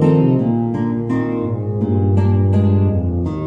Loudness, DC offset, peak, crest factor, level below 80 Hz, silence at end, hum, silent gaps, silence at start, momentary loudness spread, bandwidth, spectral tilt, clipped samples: -17 LUFS; under 0.1%; -4 dBFS; 12 dB; -38 dBFS; 0 s; none; none; 0 s; 6 LU; 4 kHz; -11 dB/octave; under 0.1%